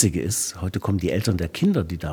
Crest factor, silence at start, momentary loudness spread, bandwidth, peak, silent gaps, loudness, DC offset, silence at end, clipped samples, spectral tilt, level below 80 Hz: 18 dB; 0 s; 4 LU; 19.5 kHz; -4 dBFS; none; -23 LUFS; under 0.1%; 0 s; under 0.1%; -5 dB/octave; -42 dBFS